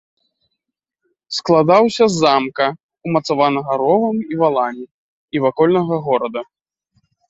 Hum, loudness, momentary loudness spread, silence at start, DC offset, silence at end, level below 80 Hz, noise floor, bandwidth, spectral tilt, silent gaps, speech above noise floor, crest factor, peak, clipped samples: none; -16 LUFS; 12 LU; 1.3 s; under 0.1%; 0.85 s; -60 dBFS; -80 dBFS; 8 kHz; -5.5 dB/octave; 2.83-2.89 s, 4.91-5.28 s; 64 dB; 16 dB; 0 dBFS; under 0.1%